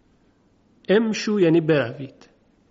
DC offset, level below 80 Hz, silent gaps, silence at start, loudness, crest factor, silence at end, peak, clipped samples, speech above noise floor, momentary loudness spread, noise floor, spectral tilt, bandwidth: under 0.1%; -64 dBFS; none; 0.9 s; -20 LUFS; 16 dB; 0.6 s; -6 dBFS; under 0.1%; 40 dB; 20 LU; -60 dBFS; -5.5 dB/octave; 7.6 kHz